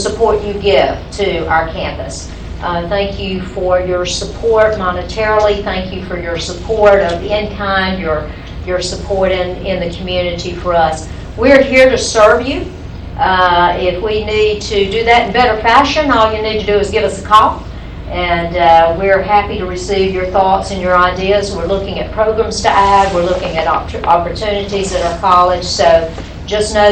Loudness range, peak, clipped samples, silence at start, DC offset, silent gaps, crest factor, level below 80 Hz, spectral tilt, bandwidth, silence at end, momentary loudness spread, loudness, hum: 5 LU; 0 dBFS; under 0.1%; 0 s; under 0.1%; none; 12 dB; -28 dBFS; -4.5 dB/octave; 10 kHz; 0 s; 11 LU; -13 LUFS; none